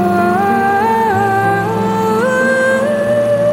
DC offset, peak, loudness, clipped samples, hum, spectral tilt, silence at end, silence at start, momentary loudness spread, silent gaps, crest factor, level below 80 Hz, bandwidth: under 0.1%; -2 dBFS; -13 LUFS; under 0.1%; none; -6 dB/octave; 0 s; 0 s; 2 LU; none; 12 dB; -48 dBFS; 17 kHz